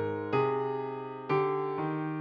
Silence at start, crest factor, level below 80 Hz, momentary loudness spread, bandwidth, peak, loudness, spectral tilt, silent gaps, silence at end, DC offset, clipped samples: 0 s; 16 dB; -74 dBFS; 7 LU; 5.4 kHz; -16 dBFS; -31 LUFS; -9 dB/octave; none; 0 s; under 0.1%; under 0.1%